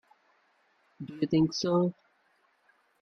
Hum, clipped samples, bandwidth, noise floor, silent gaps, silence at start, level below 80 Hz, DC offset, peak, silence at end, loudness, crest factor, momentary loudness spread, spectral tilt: none; under 0.1%; 6.6 kHz; -70 dBFS; none; 1 s; -68 dBFS; under 0.1%; -14 dBFS; 1.1 s; -28 LUFS; 18 dB; 17 LU; -6.5 dB/octave